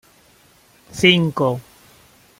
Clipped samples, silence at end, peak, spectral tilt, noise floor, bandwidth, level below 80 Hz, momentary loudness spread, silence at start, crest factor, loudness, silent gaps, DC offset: under 0.1%; 0.8 s; 0 dBFS; -5 dB/octave; -53 dBFS; 16 kHz; -56 dBFS; 17 LU; 0.95 s; 22 dB; -16 LUFS; none; under 0.1%